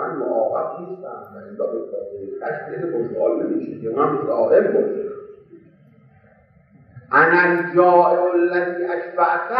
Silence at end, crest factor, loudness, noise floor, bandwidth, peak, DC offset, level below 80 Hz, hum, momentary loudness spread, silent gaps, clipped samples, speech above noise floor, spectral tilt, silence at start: 0 s; 18 dB; -19 LUFS; -53 dBFS; 5.2 kHz; -2 dBFS; under 0.1%; -68 dBFS; none; 17 LU; none; under 0.1%; 34 dB; -9.5 dB/octave; 0 s